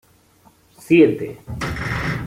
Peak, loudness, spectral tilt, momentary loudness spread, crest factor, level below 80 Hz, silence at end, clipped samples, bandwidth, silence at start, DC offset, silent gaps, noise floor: -2 dBFS; -18 LUFS; -7 dB/octave; 14 LU; 18 dB; -40 dBFS; 0 s; under 0.1%; 15.5 kHz; 0.8 s; under 0.1%; none; -54 dBFS